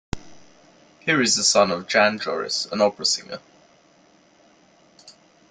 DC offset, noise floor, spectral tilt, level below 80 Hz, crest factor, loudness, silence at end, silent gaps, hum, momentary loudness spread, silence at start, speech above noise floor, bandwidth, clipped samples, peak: under 0.1%; -56 dBFS; -2 dB/octave; -50 dBFS; 22 dB; -20 LUFS; 0.4 s; none; none; 20 LU; 0.15 s; 35 dB; 11 kHz; under 0.1%; -4 dBFS